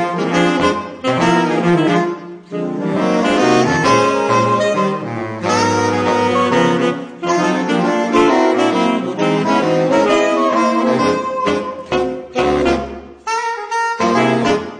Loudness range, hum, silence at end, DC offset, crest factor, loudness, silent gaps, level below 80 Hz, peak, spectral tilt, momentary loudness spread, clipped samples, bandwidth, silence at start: 3 LU; none; 0 s; under 0.1%; 16 dB; -15 LUFS; none; -44 dBFS; 0 dBFS; -5.5 dB/octave; 8 LU; under 0.1%; 10 kHz; 0 s